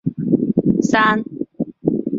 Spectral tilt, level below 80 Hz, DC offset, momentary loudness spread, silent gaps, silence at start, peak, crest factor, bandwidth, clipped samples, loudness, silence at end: -6.5 dB/octave; -50 dBFS; under 0.1%; 12 LU; none; 0.05 s; -2 dBFS; 16 dB; 7.8 kHz; under 0.1%; -18 LUFS; 0 s